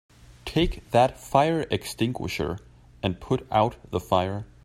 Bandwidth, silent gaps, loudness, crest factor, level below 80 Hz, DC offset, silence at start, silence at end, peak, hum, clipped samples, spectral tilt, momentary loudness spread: 16 kHz; none; -26 LUFS; 22 dB; -42 dBFS; under 0.1%; 0.45 s; 0.2 s; -4 dBFS; none; under 0.1%; -6 dB/octave; 9 LU